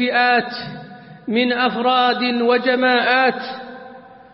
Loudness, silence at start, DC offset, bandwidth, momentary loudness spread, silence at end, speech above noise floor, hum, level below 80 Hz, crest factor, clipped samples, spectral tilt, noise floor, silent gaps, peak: -17 LUFS; 0 s; under 0.1%; 5.8 kHz; 18 LU; 0.2 s; 23 dB; none; -66 dBFS; 16 dB; under 0.1%; -9 dB/octave; -40 dBFS; none; -4 dBFS